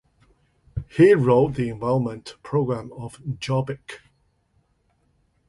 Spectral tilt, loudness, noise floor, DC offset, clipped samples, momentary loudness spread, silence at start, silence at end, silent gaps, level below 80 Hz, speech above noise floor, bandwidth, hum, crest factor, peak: -8 dB/octave; -22 LUFS; -66 dBFS; under 0.1%; under 0.1%; 20 LU; 0.75 s; 1.5 s; none; -50 dBFS; 45 dB; 11.5 kHz; none; 20 dB; -4 dBFS